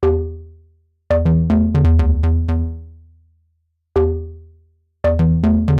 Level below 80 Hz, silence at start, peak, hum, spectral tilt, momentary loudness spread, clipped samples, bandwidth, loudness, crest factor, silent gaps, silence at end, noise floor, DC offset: -26 dBFS; 0 s; -6 dBFS; none; -10.5 dB/octave; 14 LU; under 0.1%; 4.7 kHz; -17 LUFS; 12 dB; none; 0 s; -67 dBFS; under 0.1%